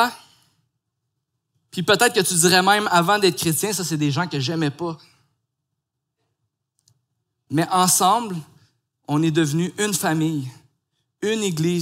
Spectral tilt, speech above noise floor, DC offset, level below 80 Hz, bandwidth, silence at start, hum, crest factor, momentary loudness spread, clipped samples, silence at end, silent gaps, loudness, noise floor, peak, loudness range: -3.5 dB/octave; 60 dB; under 0.1%; -68 dBFS; 16 kHz; 0 s; none; 20 dB; 14 LU; under 0.1%; 0 s; none; -20 LUFS; -80 dBFS; -2 dBFS; 9 LU